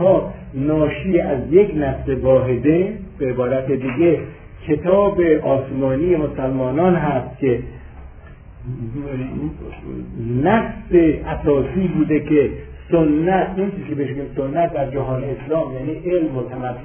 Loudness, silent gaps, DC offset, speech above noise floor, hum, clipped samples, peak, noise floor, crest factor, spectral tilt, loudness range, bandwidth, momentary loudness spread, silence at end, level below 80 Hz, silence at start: -19 LUFS; none; under 0.1%; 21 dB; none; under 0.1%; -2 dBFS; -39 dBFS; 16 dB; -12 dB/octave; 5 LU; 3.5 kHz; 12 LU; 0 s; -36 dBFS; 0 s